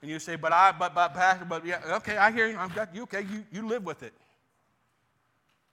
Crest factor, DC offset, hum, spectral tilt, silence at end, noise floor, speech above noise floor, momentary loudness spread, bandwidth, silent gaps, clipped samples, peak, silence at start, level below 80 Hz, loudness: 22 dB; under 0.1%; none; -4 dB/octave; 1.65 s; -72 dBFS; 45 dB; 14 LU; 14 kHz; none; under 0.1%; -8 dBFS; 0 s; -72 dBFS; -27 LUFS